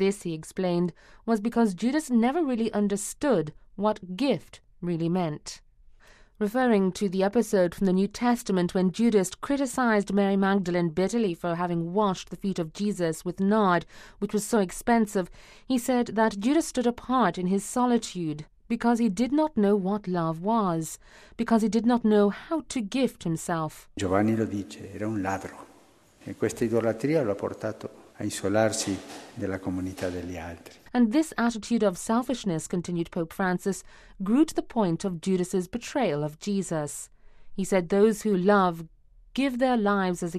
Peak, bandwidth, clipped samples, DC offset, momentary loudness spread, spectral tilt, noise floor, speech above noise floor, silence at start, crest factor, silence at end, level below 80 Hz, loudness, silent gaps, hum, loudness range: -8 dBFS; 14.5 kHz; under 0.1%; under 0.1%; 12 LU; -6 dB/octave; -58 dBFS; 32 dB; 0 s; 18 dB; 0 s; -54 dBFS; -27 LUFS; none; none; 4 LU